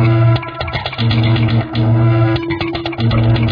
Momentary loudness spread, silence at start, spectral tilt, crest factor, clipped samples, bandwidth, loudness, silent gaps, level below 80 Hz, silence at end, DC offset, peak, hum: 7 LU; 0 s; -9 dB/octave; 10 dB; under 0.1%; 5.2 kHz; -15 LUFS; none; -32 dBFS; 0 s; under 0.1%; -2 dBFS; none